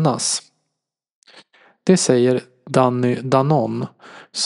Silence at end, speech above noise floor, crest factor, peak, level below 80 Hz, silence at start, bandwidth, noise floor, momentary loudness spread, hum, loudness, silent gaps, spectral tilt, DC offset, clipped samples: 0 s; 62 dB; 18 dB; 0 dBFS; -66 dBFS; 0 s; 11.5 kHz; -80 dBFS; 10 LU; none; -18 LUFS; 1.12-1.22 s; -5 dB/octave; under 0.1%; under 0.1%